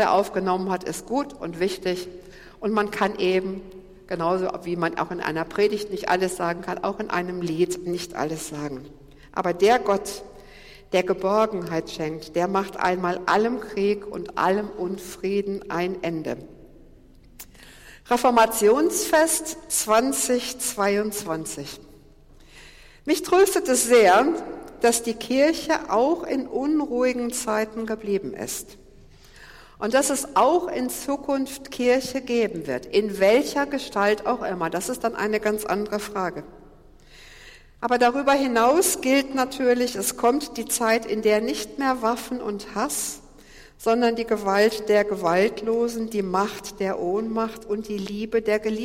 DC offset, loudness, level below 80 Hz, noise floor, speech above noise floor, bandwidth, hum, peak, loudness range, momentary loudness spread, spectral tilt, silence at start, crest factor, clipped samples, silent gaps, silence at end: under 0.1%; -23 LUFS; -52 dBFS; -50 dBFS; 27 dB; 16.5 kHz; none; -6 dBFS; 6 LU; 11 LU; -3.5 dB/octave; 0 s; 18 dB; under 0.1%; none; 0 s